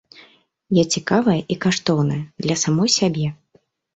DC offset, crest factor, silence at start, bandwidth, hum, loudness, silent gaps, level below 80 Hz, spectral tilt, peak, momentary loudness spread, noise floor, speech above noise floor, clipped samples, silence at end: under 0.1%; 18 dB; 0.7 s; 8.2 kHz; none; -19 LUFS; none; -56 dBFS; -4.5 dB/octave; -4 dBFS; 7 LU; -60 dBFS; 41 dB; under 0.1%; 0.6 s